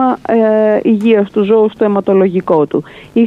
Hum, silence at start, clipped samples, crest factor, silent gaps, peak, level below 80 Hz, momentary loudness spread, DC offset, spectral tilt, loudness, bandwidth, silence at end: none; 0 s; under 0.1%; 10 dB; none; 0 dBFS; -54 dBFS; 4 LU; under 0.1%; -9 dB/octave; -12 LUFS; 4.8 kHz; 0 s